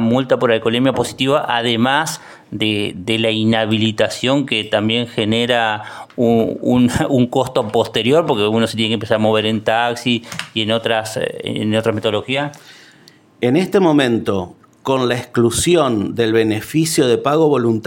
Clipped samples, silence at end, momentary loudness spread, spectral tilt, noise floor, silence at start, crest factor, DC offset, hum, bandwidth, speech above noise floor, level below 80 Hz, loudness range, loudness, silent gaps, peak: under 0.1%; 0 s; 7 LU; -5 dB/octave; -47 dBFS; 0 s; 16 dB; under 0.1%; none; 17 kHz; 31 dB; -48 dBFS; 3 LU; -16 LUFS; none; 0 dBFS